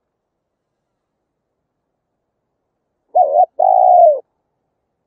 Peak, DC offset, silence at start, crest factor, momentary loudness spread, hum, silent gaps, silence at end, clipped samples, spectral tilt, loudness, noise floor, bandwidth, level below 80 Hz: 0 dBFS; under 0.1%; 3.15 s; 16 dB; 9 LU; none; none; 0.85 s; under 0.1%; -6.5 dB/octave; -12 LUFS; -74 dBFS; 1.1 kHz; -84 dBFS